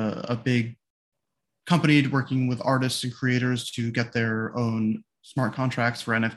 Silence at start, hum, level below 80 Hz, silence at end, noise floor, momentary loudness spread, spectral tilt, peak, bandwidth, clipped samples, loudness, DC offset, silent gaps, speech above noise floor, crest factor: 0 s; none; -64 dBFS; 0 s; -83 dBFS; 8 LU; -6 dB/octave; -6 dBFS; 12.5 kHz; under 0.1%; -25 LUFS; under 0.1%; 0.90-1.12 s; 59 dB; 20 dB